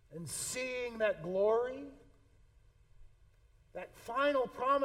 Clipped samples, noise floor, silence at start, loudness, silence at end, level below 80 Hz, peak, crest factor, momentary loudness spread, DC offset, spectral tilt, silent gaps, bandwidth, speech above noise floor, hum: under 0.1%; -65 dBFS; 0.1 s; -35 LUFS; 0 s; -64 dBFS; -20 dBFS; 18 dB; 17 LU; under 0.1%; -3.5 dB/octave; none; 16.5 kHz; 30 dB; none